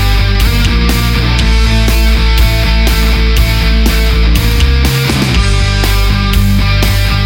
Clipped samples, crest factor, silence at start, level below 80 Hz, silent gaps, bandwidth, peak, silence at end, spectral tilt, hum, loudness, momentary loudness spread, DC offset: under 0.1%; 8 dB; 0 s; -10 dBFS; none; 17 kHz; 0 dBFS; 0 s; -5 dB/octave; none; -11 LUFS; 1 LU; under 0.1%